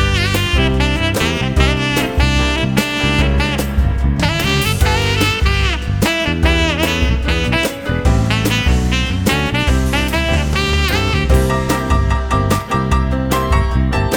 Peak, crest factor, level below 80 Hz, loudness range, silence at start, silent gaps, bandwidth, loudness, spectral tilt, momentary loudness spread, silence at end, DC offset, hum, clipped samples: 0 dBFS; 14 dB; -18 dBFS; 1 LU; 0 s; none; 20 kHz; -15 LUFS; -5 dB/octave; 2 LU; 0 s; under 0.1%; none; under 0.1%